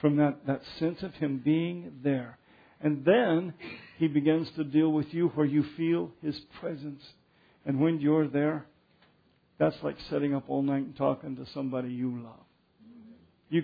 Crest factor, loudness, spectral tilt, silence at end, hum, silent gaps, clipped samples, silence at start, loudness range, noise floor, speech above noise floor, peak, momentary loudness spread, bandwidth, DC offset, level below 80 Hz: 20 dB; -29 LUFS; -10 dB/octave; 0 s; none; none; under 0.1%; 0 s; 5 LU; -67 dBFS; 38 dB; -10 dBFS; 13 LU; 5 kHz; under 0.1%; -68 dBFS